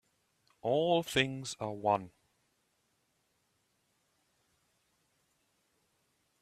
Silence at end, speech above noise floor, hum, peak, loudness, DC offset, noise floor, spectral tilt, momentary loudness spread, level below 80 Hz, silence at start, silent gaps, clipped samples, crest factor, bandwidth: 4.35 s; 45 dB; none; -12 dBFS; -33 LUFS; under 0.1%; -77 dBFS; -4.5 dB/octave; 10 LU; -72 dBFS; 0.65 s; none; under 0.1%; 26 dB; 14.5 kHz